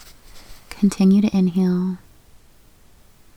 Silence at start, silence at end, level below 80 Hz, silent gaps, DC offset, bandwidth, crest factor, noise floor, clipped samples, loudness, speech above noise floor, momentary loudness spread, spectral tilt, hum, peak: 0.35 s; 1.4 s; -50 dBFS; none; under 0.1%; 12.5 kHz; 14 dB; -50 dBFS; under 0.1%; -19 LUFS; 33 dB; 16 LU; -7.5 dB/octave; none; -6 dBFS